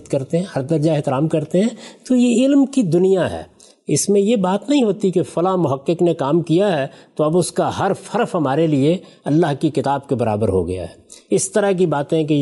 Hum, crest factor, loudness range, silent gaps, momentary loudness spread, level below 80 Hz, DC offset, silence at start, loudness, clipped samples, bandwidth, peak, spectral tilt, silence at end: none; 12 dB; 2 LU; none; 6 LU; -56 dBFS; under 0.1%; 0.1 s; -18 LUFS; under 0.1%; 11.5 kHz; -6 dBFS; -6 dB/octave; 0 s